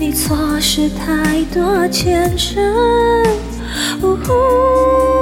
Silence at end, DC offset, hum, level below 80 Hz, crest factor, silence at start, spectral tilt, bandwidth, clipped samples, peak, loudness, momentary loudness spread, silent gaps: 0 s; under 0.1%; none; -28 dBFS; 12 dB; 0 s; -4.5 dB/octave; 17 kHz; under 0.1%; -2 dBFS; -14 LUFS; 5 LU; none